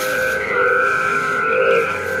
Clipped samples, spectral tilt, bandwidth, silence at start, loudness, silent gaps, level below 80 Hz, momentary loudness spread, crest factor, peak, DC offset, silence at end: under 0.1%; -3.5 dB/octave; 16 kHz; 0 s; -17 LUFS; none; -52 dBFS; 3 LU; 14 dB; -4 dBFS; under 0.1%; 0 s